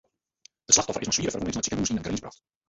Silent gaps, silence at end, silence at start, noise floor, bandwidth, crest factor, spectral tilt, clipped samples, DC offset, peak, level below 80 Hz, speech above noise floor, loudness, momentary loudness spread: none; 0.35 s; 0.7 s; -60 dBFS; 8.2 kHz; 24 dB; -2.5 dB/octave; under 0.1%; under 0.1%; -4 dBFS; -52 dBFS; 30 dB; -25 LUFS; 11 LU